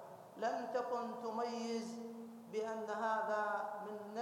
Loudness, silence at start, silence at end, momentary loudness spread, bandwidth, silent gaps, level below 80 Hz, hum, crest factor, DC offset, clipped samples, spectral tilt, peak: -41 LUFS; 0 s; 0 s; 10 LU; 17 kHz; none; under -90 dBFS; none; 16 dB; under 0.1%; under 0.1%; -4.5 dB/octave; -26 dBFS